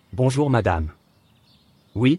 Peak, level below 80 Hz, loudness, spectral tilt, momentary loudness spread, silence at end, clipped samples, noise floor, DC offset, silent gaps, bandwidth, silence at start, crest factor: -6 dBFS; -42 dBFS; -22 LUFS; -7 dB/octave; 14 LU; 0 s; under 0.1%; -58 dBFS; under 0.1%; none; 12 kHz; 0.15 s; 16 dB